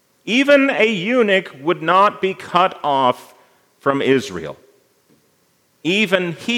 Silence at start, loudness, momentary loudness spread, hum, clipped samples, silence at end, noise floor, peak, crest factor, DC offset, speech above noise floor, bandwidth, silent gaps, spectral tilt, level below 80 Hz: 0.25 s; -17 LUFS; 11 LU; none; under 0.1%; 0 s; -60 dBFS; 0 dBFS; 18 dB; under 0.1%; 44 dB; 16 kHz; none; -5 dB/octave; -68 dBFS